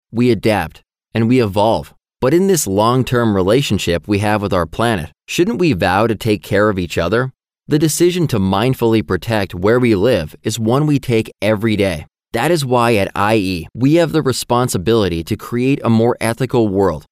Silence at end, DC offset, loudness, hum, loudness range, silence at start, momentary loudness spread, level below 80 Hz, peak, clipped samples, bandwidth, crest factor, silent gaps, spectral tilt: 0.1 s; under 0.1%; -16 LUFS; none; 1 LU; 0.15 s; 6 LU; -44 dBFS; -2 dBFS; under 0.1%; 16 kHz; 12 dB; none; -5.5 dB/octave